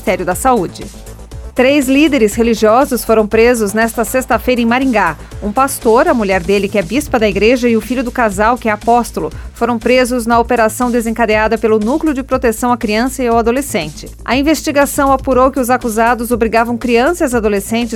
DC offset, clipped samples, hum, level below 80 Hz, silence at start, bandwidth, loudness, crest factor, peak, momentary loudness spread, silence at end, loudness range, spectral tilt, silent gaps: under 0.1%; under 0.1%; none; -32 dBFS; 0 s; 18 kHz; -13 LUFS; 12 dB; 0 dBFS; 7 LU; 0 s; 2 LU; -4.5 dB/octave; none